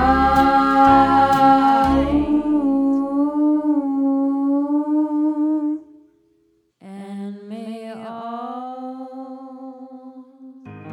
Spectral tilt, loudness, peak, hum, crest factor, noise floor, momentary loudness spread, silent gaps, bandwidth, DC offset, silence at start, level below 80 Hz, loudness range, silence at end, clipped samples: -7 dB/octave; -17 LUFS; -2 dBFS; none; 16 dB; -62 dBFS; 21 LU; none; 10 kHz; under 0.1%; 0 s; -40 dBFS; 17 LU; 0 s; under 0.1%